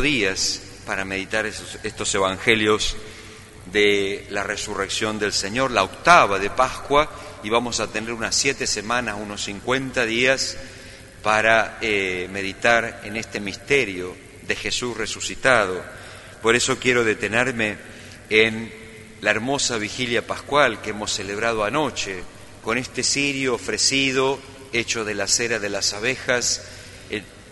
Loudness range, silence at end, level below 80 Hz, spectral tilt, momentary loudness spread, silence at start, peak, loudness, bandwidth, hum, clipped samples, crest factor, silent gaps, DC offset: 3 LU; 0 s; -46 dBFS; -2.5 dB/octave; 14 LU; 0 s; 0 dBFS; -21 LUFS; 11.5 kHz; none; under 0.1%; 22 dB; none; under 0.1%